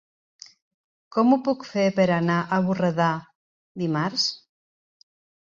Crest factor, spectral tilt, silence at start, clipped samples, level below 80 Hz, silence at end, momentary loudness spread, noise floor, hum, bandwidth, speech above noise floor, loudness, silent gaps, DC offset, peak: 18 dB; -6 dB/octave; 1.15 s; under 0.1%; -66 dBFS; 1.05 s; 10 LU; under -90 dBFS; none; 7.6 kHz; over 68 dB; -23 LUFS; 3.35-3.75 s; under 0.1%; -6 dBFS